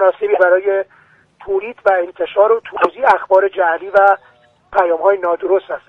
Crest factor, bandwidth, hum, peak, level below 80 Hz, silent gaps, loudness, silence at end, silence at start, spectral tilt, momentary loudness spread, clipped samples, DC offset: 14 dB; 5.6 kHz; none; 0 dBFS; -56 dBFS; none; -15 LUFS; 0.1 s; 0 s; -5.5 dB/octave; 8 LU; under 0.1%; under 0.1%